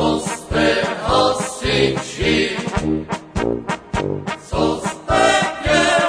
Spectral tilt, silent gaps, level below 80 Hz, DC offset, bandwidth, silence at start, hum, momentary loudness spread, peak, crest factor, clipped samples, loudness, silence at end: -4 dB/octave; none; -34 dBFS; under 0.1%; 11 kHz; 0 s; none; 9 LU; 0 dBFS; 18 dB; under 0.1%; -19 LUFS; 0 s